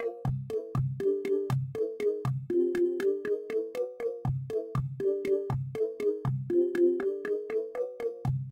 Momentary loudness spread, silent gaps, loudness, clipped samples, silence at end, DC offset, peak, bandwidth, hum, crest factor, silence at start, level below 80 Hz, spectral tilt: 7 LU; none; -31 LUFS; under 0.1%; 0 s; under 0.1%; -16 dBFS; 15.5 kHz; none; 14 dB; 0 s; -56 dBFS; -9 dB/octave